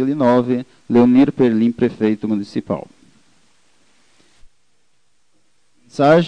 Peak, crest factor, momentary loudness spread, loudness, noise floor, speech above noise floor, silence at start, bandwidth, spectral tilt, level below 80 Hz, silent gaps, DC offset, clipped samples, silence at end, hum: 0 dBFS; 18 dB; 11 LU; -16 LUFS; -67 dBFS; 51 dB; 0 s; 9 kHz; -8 dB/octave; -54 dBFS; none; 0.2%; under 0.1%; 0 s; none